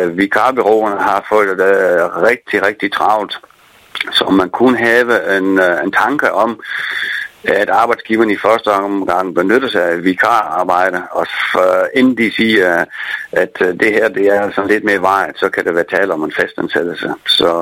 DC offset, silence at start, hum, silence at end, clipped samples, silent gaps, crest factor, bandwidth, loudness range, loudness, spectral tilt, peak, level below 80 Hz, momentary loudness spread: under 0.1%; 0 s; none; 0 s; under 0.1%; none; 14 dB; 17 kHz; 1 LU; -13 LUFS; -4.5 dB/octave; 0 dBFS; -54 dBFS; 6 LU